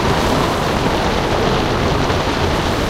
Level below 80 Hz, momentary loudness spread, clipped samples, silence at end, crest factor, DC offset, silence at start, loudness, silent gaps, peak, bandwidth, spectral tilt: -26 dBFS; 1 LU; under 0.1%; 0 s; 14 dB; under 0.1%; 0 s; -16 LUFS; none; -2 dBFS; 16 kHz; -5 dB/octave